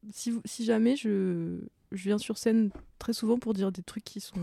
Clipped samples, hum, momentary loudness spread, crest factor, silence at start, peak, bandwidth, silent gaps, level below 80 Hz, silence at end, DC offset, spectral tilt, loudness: under 0.1%; none; 14 LU; 16 dB; 0.05 s; -14 dBFS; 15 kHz; none; -60 dBFS; 0 s; under 0.1%; -5.5 dB/octave; -30 LUFS